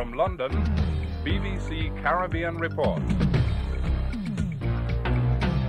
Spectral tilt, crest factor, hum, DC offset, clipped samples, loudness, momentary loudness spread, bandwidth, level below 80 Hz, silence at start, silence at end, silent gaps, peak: -8 dB/octave; 14 dB; none; under 0.1%; under 0.1%; -27 LUFS; 5 LU; 9.6 kHz; -30 dBFS; 0 s; 0 s; none; -10 dBFS